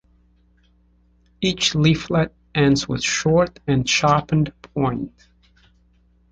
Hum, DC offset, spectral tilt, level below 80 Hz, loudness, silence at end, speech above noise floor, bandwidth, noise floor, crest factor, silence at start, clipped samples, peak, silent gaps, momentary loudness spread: 60 Hz at -40 dBFS; under 0.1%; -5 dB/octave; -46 dBFS; -20 LUFS; 1.25 s; 39 dB; 9 kHz; -58 dBFS; 18 dB; 1.4 s; under 0.1%; -4 dBFS; none; 7 LU